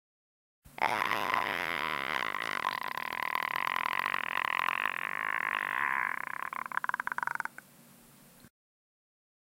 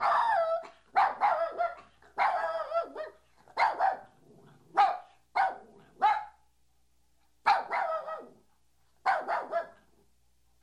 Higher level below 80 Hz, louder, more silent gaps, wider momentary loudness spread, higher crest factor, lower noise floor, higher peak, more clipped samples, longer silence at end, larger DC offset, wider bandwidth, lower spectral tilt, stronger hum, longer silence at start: about the same, -74 dBFS vs -72 dBFS; about the same, -32 LUFS vs -30 LUFS; neither; second, 6 LU vs 15 LU; about the same, 24 dB vs 20 dB; second, -58 dBFS vs -73 dBFS; about the same, -10 dBFS vs -12 dBFS; neither; about the same, 1 s vs 0.9 s; neither; first, 17 kHz vs 11 kHz; about the same, -2 dB/octave vs -3 dB/octave; neither; first, 0.65 s vs 0 s